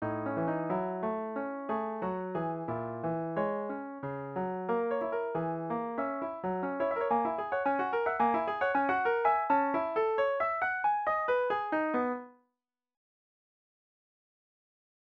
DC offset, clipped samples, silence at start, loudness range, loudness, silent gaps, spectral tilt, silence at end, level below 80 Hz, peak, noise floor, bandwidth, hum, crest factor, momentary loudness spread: under 0.1%; under 0.1%; 0 s; 6 LU; -32 LUFS; none; -9 dB/octave; 2.75 s; -70 dBFS; -16 dBFS; -87 dBFS; 6 kHz; none; 16 dB; 7 LU